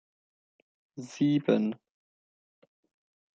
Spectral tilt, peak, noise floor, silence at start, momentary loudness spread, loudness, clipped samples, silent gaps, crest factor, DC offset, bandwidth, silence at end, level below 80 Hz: -7 dB/octave; -10 dBFS; under -90 dBFS; 0.95 s; 20 LU; -28 LUFS; under 0.1%; none; 24 dB; under 0.1%; 7.6 kHz; 1.6 s; -78 dBFS